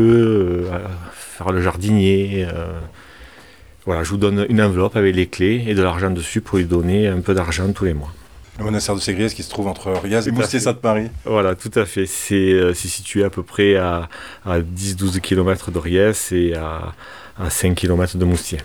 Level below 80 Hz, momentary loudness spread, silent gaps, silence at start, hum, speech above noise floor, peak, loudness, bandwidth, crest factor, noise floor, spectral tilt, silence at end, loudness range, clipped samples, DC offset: -36 dBFS; 12 LU; none; 0 s; none; 27 dB; 0 dBFS; -19 LUFS; 18.5 kHz; 18 dB; -45 dBFS; -5.5 dB/octave; 0 s; 3 LU; under 0.1%; 0.3%